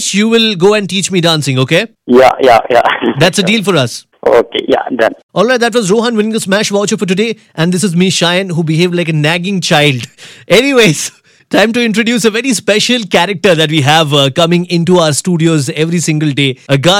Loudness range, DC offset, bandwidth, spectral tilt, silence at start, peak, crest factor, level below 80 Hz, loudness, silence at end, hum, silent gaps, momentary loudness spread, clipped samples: 2 LU; under 0.1%; 16.5 kHz; -4.5 dB/octave; 0 s; 0 dBFS; 10 dB; -48 dBFS; -10 LUFS; 0 s; none; 5.23-5.29 s; 5 LU; under 0.1%